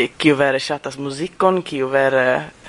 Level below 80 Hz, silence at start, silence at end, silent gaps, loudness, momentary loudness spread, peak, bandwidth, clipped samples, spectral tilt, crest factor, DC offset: -56 dBFS; 0 s; 0 s; none; -18 LUFS; 10 LU; 0 dBFS; 11 kHz; under 0.1%; -5 dB/octave; 18 dB; under 0.1%